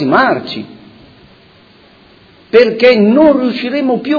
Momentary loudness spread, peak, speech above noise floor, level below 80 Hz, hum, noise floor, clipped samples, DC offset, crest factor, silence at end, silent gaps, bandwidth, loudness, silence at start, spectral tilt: 15 LU; 0 dBFS; 34 dB; -52 dBFS; none; -44 dBFS; 0.5%; under 0.1%; 12 dB; 0 s; none; 5.4 kHz; -10 LUFS; 0 s; -7.5 dB/octave